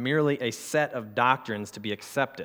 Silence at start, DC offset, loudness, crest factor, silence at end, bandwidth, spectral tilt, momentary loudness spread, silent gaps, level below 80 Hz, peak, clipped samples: 0 s; under 0.1%; -28 LUFS; 20 dB; 0 s; over 20 kHz; -5 dB/octave; 10 LU; none; -76 dBFS; -6 dBFS; under 0.1%